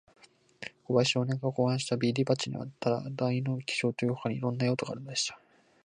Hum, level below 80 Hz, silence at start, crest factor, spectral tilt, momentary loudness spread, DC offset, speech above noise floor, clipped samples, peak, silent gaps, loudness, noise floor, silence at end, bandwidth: none; -70 dBFS; 0.6 s; 18 dB; -5 dB/octave; 6 LU; under 0.1%; 21 dB; under 0.1%; -12 dBFS; none; -30 LUFS; -50 dBFS; 0.5 s; 10 kHz